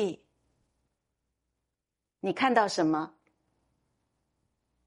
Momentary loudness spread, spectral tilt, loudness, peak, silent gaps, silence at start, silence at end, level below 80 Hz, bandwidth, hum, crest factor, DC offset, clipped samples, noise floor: 15 LU; -4.5 dB/octave; -28 LUFS; -10 dBFS; none; 0 s; 1.8 s; -76 dBFS; 11.5 kHz; none; 24 dB; under 0.1%; under 0.1%; -87 dBFS